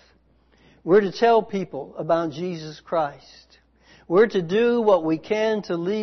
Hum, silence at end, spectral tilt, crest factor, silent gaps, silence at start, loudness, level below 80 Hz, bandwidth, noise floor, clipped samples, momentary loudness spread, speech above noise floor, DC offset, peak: none; 0 s; -6.5 dB/octave; 16 dB; none; 0.85 s; -22 LUFS; -62 dBFS; 6.4 kHz; -59 dBFS; under 0.1%; 12 LU; 38 dB; under 0.1%; -6 dBFS